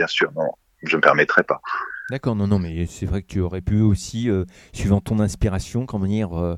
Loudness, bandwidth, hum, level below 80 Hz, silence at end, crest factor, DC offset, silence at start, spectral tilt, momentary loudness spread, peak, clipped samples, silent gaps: -21 LUFS; 13.5 kHz; none; -36 dBFS; 0 s; 22 dB; under 0.1%; 0 s; -6 dB/octave; 11 LU; 0 dBFS; under 0.1%; none